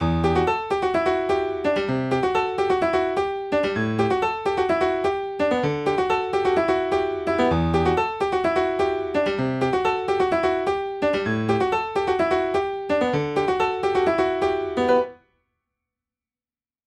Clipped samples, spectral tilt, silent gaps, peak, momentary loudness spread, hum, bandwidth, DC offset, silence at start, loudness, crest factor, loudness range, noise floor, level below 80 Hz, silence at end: under 0.1%; -6.5 dB/octave; none; -8 dBFS; 3 LU; none; 10.5 kHz; under 0.1%; 0 s; -22 LUFS; 14 dB; 1 LU; under -90 dBFS; -44 dBFS; 1.7 s